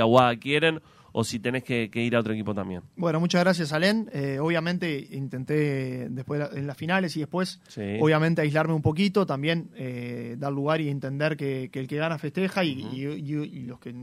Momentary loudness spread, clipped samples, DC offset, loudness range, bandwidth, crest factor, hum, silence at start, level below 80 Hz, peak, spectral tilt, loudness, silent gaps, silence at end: 11 LU; under 0.1%; under 0.1%; 3 LU; 15 kHz; 22 dB; none; 0 s; -62 dBFS; -4 dBFS; -6 dB/octave; -27 LUFS; none; 0 s